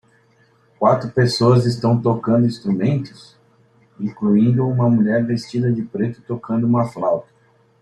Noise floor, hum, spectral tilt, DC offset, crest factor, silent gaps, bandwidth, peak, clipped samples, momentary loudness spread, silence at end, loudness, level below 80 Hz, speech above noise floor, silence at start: -56 dBFS; none; -8 dB/octave; under 0.1%; 16 dB; none; 10.5 kHz; -2 dBFS; under 0.1%; 9 LU; 0.6 s; -18 LUFS; -56 dBFS; 39 dB; 0.8 s